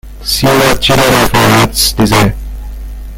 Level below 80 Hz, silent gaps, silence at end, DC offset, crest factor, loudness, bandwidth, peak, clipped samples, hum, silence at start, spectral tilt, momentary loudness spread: -22 dBFS; none; 0 s; under 0.1%; 10 dB; -9 LUFS; 17.5 kHz; 0 dBFS; 0.1%; none; 0.05 s; -4 dB/octave; 18 LU